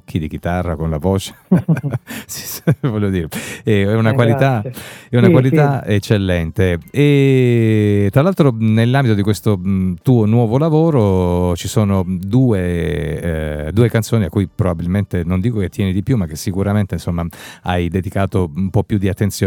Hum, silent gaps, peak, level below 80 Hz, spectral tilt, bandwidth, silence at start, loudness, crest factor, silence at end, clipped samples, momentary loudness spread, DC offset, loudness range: none; none; 0 dBFS; -40 dBFS; -7 dB/octave; 18 kHz; 0.1 s; -16 LUFS; 16 dB; 0 s; under 0.1%; 8 LU; under 0.1%; 5 LU